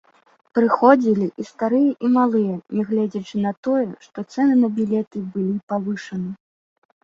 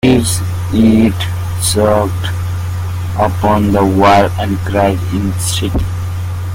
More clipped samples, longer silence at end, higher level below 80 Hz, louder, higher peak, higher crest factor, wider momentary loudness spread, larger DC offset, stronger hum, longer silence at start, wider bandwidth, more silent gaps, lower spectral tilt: neither; first, 0.7 s vs 0 s; second, -64 dBFS vs -32 dBFS; second, -20 LUFS vs -13 LUFS; about the same, -2 dBFS vs 0 dBFS; first, 18 dB vs 12 dB; first, 13 LU vs 10 LU; neither; neither; first, 0.55 s vs 0.05 s; second, 7.4 kHz vs 16.5 kHz; first, 3.57-3.63 s, 5.07-5.11 s, 5.63-5.67 s vs none; first, -8 dB/octave vs -5.5 dB/octave